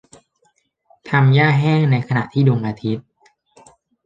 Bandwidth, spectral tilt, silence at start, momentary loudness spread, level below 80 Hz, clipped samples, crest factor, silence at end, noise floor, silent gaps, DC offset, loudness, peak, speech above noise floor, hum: 7.8 kHz; -8.5 dB/octave; 1.05 s; 12 LU; -56 dBFS; under 0.1%; 16 dB; 1.05 s; -64 dBFS; none; under 0.1%; -17 LUFS; -2 dBFS; 48 dB; none